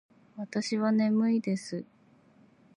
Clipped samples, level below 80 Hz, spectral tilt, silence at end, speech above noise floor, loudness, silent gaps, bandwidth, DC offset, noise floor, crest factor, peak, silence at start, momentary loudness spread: under 0.1%; -82 dBFS; -6 dB/octave; 0.95 s; 33 dB; -29 LUFS; none; 10.5 kHz; under 0.1%; -61 dBFS; 14 dB; -16 dBFS; 0.35 s; 15 LU